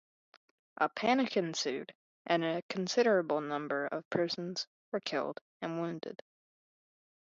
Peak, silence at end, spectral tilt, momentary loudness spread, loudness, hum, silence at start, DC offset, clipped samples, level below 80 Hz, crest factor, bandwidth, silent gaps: -14 dBFS; 1.1 s; -4.5 dB/octave; 13 LU; -34 LUFS; none; 0.8 s; under 0.1%; under 0.1%; -82 dBFS; 22 dB; 7.8 kHz; 1.95-2.25 s, 2.62-2.69 s, 4.05-4.11 s, 4.67-4.92 s, 5.41-5.60 s